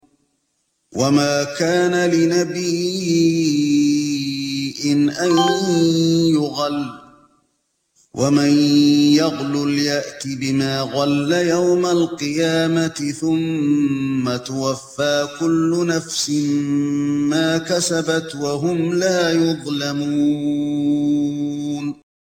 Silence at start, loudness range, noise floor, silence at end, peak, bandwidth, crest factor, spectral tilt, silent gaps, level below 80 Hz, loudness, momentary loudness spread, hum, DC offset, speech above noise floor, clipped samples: 0.9 s; 2 LU; -69 dBFS; 0.45 s; -4 dBFS; 16 kHz; 14 dB; -5 dB/octave; none; -60 dBFS; -18 LUFS; 7 LU; none; under 0.1%; 52 dB; under 0.1%